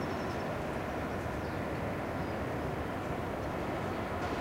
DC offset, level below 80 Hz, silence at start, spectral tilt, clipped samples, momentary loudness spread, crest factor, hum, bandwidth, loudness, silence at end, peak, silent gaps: under 0.1%; -48 dBFS; 0 s; -6.5 dB/octave; under 0.1%; 1 LU; 12 dB; none; 16 kHz; -36 LUFS; 0 s; -22 dBFS; none